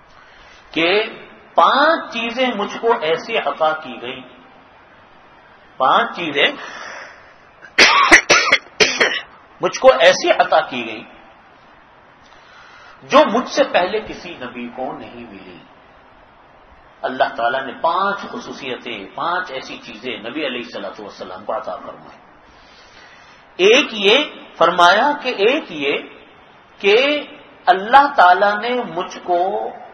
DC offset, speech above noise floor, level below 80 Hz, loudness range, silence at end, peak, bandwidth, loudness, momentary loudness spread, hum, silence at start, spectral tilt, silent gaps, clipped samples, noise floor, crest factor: under 0.1%; 30 dB; -54 dBFS; 12 LU; 0.05 s; 0 dBFS; 12 kHz; -16 LUFS; 19 LU; none; 0.75 s; -2 dB/octave; none; under 0.1%; -47 dBFS; 18 dB